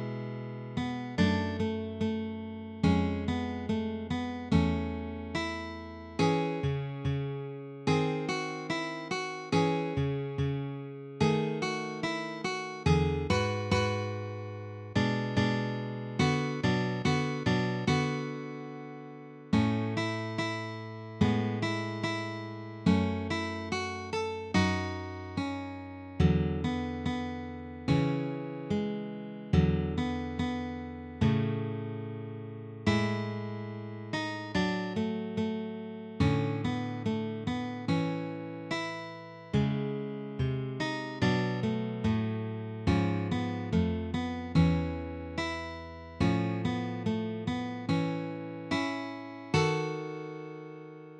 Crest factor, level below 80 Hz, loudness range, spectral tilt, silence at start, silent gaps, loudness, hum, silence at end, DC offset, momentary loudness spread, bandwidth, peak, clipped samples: 20 dB; -50 dBFS; 3 LU; -6.5 dB/octave; 0 s; none; -32 LUFS; none; 0 s; under 0.1%; 12 LU; 10.5 kHz; -12 dBFS; under 0.1%